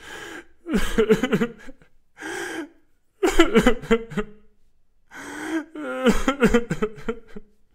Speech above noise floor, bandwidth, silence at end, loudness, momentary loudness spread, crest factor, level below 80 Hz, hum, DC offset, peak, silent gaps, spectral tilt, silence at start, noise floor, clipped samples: 37 dB; 16 kHz; 0.3 s; -23 LUFS; 18 LU; 24 dB; -34 dBFS; none; under 0.1%; 0 dBFS; none; -5 dB/octave; 0 s; -58 dBFS; under 0.1%